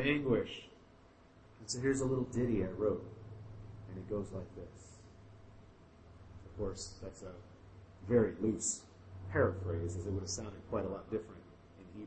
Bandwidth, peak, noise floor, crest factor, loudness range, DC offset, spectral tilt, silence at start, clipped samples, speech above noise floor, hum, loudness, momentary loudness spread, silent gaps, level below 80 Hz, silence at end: 8.4 kHz; -18 dBFS; -62 dBFS; 22 dB; 12 LU; under 0.1%; -5 dB/octave; 0 s; under 0.1%; 25 dB; none; -37 LUFS; 24 LU; none; -58 dBFS; 0 s